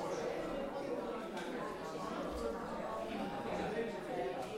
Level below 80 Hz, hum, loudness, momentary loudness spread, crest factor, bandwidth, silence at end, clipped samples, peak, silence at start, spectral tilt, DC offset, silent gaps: -60 dBFS; none; -41 LUFS; 3 LU; 14 dB; 16 kHz; 0 s; under 0.1%; -26 dBFS; 0 s; -5.5 dB/octave; under 0.1%; none